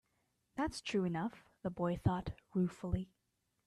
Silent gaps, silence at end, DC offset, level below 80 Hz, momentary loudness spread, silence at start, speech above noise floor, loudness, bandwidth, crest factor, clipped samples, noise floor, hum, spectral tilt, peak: none; 0.6 s; under 0.1%; -56 dBFS; 9 LU; 0.55 s; 43 dB; -39 LUFS; 12 kHz; 22 dB; under 0.1%; -81 dBFS; none; -7 dB/octave; -18 dBFS